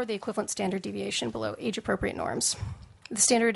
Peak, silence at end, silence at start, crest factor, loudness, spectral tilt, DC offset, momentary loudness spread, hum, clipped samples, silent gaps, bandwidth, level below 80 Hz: -8 dBFS; 0 s; 0 s; 22 dB; -29 LUFS; -3 dB/octave; under 0.1%; 11 LU; none; under 0.1%; none; 11.5 kHz; -54 dBFS